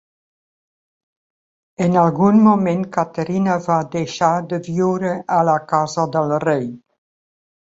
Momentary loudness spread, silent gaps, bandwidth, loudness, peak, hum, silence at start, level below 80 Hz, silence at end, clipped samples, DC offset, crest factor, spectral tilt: 9 LU; none; 7.8 kHz; -18 LUFS; -2 dBFS; none; 1.8 s; -60 dBFS; 0.85 s; under 0.1%; under 0.1%; 16 dB; -7 dB/octave